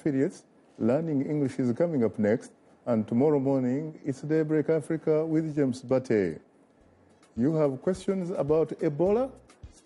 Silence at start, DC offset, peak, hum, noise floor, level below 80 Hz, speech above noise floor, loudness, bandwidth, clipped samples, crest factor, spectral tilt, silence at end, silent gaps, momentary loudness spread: 0.05 s; under 0.1%; -14 dBFS; none; -60 dBFS; -60 dBFS; 34 dB; -27 LUFS; 11.5 kHz; under 0.1%; 14 dB; -8.5 dB/octave; 0.2 s; none; 6 LU